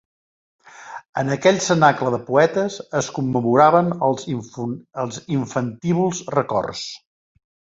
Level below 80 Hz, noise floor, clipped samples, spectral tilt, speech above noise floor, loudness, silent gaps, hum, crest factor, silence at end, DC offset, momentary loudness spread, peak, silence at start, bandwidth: -58 dBFS; under -90 dBFS; under 0.1%; -5.5 dB/octave; over 71 dB; -20 LUFS; 1.09-1.13 s; none; 20 dB; 0.8 s; under 0.1%; 14 LU; -2 dBFS; 0.8 s; 7.8 kHz